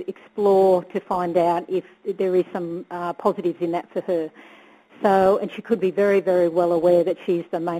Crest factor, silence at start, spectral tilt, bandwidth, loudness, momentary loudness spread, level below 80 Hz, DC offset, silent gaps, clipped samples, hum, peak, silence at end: 16 dB; 0 s; -7.5 dB/octave; 13 kHz; -21 LUFS; 11 LU; -64 dBFS; under 0.1%; none; under 0.1%; none; -6 dBFS; 0 s